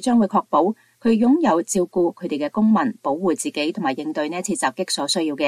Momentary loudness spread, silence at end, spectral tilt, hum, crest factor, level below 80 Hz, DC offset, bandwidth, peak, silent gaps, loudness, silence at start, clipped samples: 7 LU; 0 s; -4.5 dB/octave; none; 14 dB; -62 dBFS; under 0.1%; 13.5 kHz; -6 dBFS; none; -21 LUFS; 0 s; under 0.1%